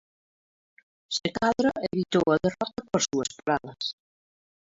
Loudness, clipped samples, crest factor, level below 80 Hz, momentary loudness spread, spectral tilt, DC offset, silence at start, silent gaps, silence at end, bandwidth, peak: -27 LUFS; under 0.1%; 20 dB; -60 dBFS; 9 LU; -4 dB/octave; under 0.1%; 1.1 s; none; 0.85 s; 8 kHz; -10 dBFS